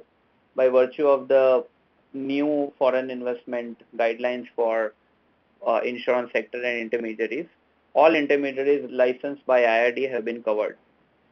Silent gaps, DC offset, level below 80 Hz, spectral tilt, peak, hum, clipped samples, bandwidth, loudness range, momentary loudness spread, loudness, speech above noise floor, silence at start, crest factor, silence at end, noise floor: none; under 0.1%; -76 dBFS; -6 dB/octave; -4 dBFS; none; under 0.1%; 6.4 kHz; 5 LU; 12 LU; -24 LUFS; 41 dB; 0.55 s; 20 dB; 0.6 s; -64 dBFS